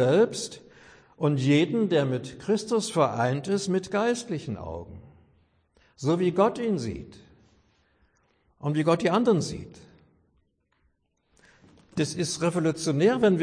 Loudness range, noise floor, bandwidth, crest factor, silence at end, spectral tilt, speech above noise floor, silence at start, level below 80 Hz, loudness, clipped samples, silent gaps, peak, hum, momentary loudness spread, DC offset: 5 LU; -71 dBFS; 10.5 kHz; 18 dB; 0 s; -6 dB/octave; 46 dB; 0 s; -58 dBFS; -26 LUFS; under 0.1%; none; -8 dBFS; none; 14 LU; under 0.1%